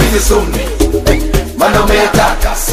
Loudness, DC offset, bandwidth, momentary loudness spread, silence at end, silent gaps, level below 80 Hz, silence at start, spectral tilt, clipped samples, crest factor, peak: -11 LUFS; under 0.1%; 16 kHz; 5 LU; 0 s; none; -16 dBFS; 0 s; -4 dB/octave; under 0.1%; 10 dB; 0 dBFS